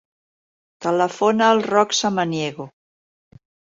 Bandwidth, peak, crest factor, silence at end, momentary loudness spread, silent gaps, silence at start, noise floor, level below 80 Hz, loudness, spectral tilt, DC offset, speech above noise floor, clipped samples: 7.8 kHz; -4 dBFS; 18 dB; 1 s; 12 LU; none; 0.8 s; under -90 dBFS; -66 dBFS; -19 LUFS; -4 dB/octave; under 0.1%; over 71 dB; under 0.1%